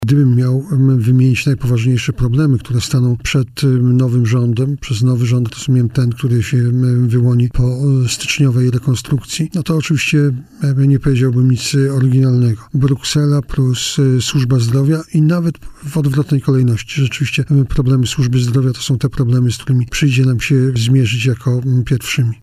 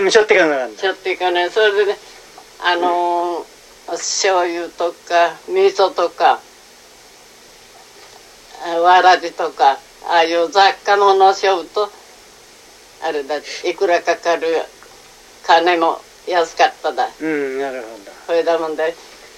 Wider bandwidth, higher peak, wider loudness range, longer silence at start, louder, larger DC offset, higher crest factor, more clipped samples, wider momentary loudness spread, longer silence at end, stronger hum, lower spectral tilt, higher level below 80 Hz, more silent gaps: about the same, 13.5 kHz vs 14 kHz; about the same, -2 dBFS vs 0 dBFS; second, 1 LU vs 6 LU; about the same, 0 s vs 0 s; about the same, -14 LUFS vs -16 LUFS; neither; second, 10 dB vs 16 dB; neither; second, 4 LU vs 12 LU; second, 0.1 s vs 0.35 s; neither; first, -6 dB/octave vs -1.5 dB/octave; first, -34 dBFS vs -60 dBFS; neither